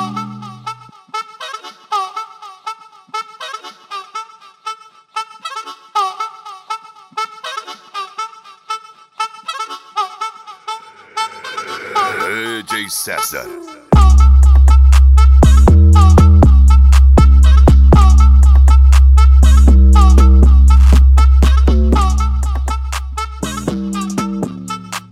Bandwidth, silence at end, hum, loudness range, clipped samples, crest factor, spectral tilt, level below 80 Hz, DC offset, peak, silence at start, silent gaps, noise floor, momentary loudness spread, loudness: 12.5 kHz; 0.15 s; none; 17 LU; under 0.1%; 10 dB; -6.5 dB/octave; -10 dBFS; under 0.1%; 0 dBFS; 0 s; none; -32 dBFS; 20 LU; -11 LUFS